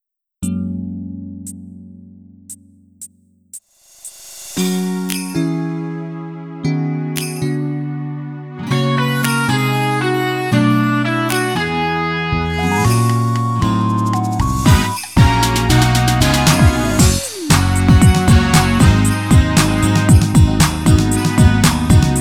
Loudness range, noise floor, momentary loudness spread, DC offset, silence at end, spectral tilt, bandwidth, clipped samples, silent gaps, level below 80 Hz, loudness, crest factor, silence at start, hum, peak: 14 LU; -43 dBFS; 18 LU; under 0.1%; 0 s; -5 dB/octave; 17.5 kHz; under 0.1%; none; -26 dBFS; -15 LUFS; 14 dB; 0.4 s; none; 0 dBFS